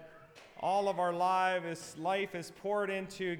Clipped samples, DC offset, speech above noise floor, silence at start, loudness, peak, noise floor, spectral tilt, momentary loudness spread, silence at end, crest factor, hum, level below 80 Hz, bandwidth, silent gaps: under 0.1%; under 0.1%; 23 dB; 0 s; -34 LUFS; -20 dBFS; -56 dBFS; -4.5 dB/octave; 10 LU; 0 s; 14 dB; none; -76 dBFS; 19 kHz; none